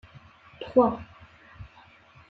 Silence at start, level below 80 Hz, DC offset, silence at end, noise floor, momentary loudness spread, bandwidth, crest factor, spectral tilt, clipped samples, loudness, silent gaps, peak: 0.6 s; -58 dBFS; under 0.1%; 0.65 s; -55 dBFS; 26 LU; 5 kHz; 22 dB; -9 dB/octave; under 0.1%; -24 LUFS; none; -8 dBFS